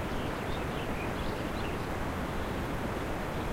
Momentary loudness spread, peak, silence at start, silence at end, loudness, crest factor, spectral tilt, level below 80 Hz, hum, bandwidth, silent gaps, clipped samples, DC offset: 0 LU; -22 dBFS; 0 s; 0 s; -35 LUFS; 12 dB; -6 dB/octave; -42 dBFS; none; 16 kHz; none; under 0.1%; under 0.1%